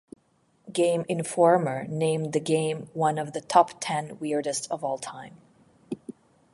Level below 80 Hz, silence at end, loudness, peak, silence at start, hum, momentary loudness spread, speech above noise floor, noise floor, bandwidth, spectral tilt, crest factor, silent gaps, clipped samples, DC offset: -72 dBFS; 0.4 s; -26 LUFS; -4 dBFS; 0.65 s; none; 17 LU; 41 dB; -66 dBFS; 11.5 kHz; -5 dB/octave; 22 dB; none; under 0.1%; under 0.1%